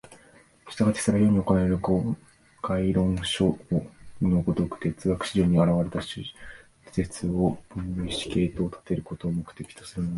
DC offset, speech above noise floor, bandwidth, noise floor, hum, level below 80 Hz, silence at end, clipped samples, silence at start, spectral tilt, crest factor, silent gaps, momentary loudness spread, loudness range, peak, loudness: under 0.1%; 30 dB; 11.5 kHz; -56 dBFS; none; -44 dBFS; 0 s; under 0.1%; 0.1 s; -6.5 dB/octave; 20 dB; none; 15 LU; 5 LU; -8 dBFS; -26 LUFS